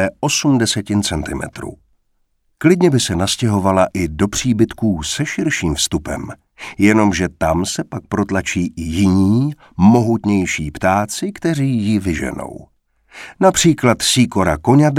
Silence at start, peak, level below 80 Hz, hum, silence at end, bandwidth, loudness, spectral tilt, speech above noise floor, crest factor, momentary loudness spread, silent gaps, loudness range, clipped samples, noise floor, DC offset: 0 s; 0 dBFS; -38 dBFS; none; 0 s; 16 kHz; -16 LUFS; -5 dB/octave; 48 dB; 16 dB; 12 LU; none; 2 LU; under 0.1%; -63 dBFS; under 0.1%